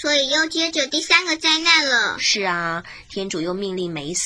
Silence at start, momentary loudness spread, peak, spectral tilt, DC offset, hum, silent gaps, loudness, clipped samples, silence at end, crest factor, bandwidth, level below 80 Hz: 0 s; 12 LU; 0 dBFS; -1.5 dB/octave; under 0.1%; none; none; -18 LUFS; under 0.1%; 0 s; 20 dB; 10.5 kHz; -56 dBFS